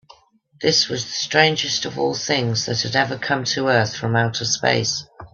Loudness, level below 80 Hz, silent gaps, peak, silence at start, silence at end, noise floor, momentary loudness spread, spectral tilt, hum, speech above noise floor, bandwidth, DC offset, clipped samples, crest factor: -19 LUFS; -58 dBFS; none; 0 dBFS; 0.6 s; 0.05 s; -52 dBFS; 6 LU; -3 dB/octave; none; 31 dB; 7.6 kHz; under 0.1%; under 0.1%; 20 dB